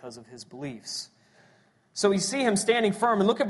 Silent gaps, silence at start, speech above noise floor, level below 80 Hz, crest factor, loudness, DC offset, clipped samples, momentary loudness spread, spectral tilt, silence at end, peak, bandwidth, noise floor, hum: none; 0.05 s; 36 dB; -68 dBFS; 18 dB; -25 LUFS; under 0.1%; under 0.1%; 21 LU; -4 dB/octave; 0 s; -8 dBFS; 11.5 kHz; -62 dBFS; none